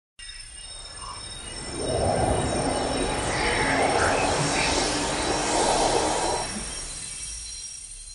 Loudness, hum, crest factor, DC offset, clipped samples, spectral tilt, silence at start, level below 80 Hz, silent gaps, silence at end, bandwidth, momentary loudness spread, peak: -25 LUFS; none; 16 dB; under 0.1%; under 0.1%; -3 dB/octave; 0.2 s; -40 dBFS; none; 0 s; 11.5 kHz; 15 LU; -10 dBFS